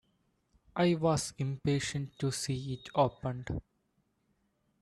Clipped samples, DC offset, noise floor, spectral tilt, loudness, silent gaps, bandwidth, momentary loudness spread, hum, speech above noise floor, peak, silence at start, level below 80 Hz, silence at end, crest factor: under 0.1%; under 0.1%; -76 dBFS; -5.5 dB/octave; -33 LUFS; none; 13 kHz; 10 LU; none; 44 dB; -14 dBFS; 0.75 s; -58 dBFS; 1.2 s; 20 dB